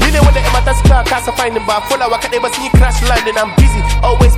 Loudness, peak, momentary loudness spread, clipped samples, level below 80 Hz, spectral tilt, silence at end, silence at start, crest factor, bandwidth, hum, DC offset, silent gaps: -12 LUFS; 0 dBFS; 5 LU; 0.3%; -14 dBFS; -5 dB/octave; 0 s; 0 s; 10 dB; 15.5 kHz; none; under 0.1%; none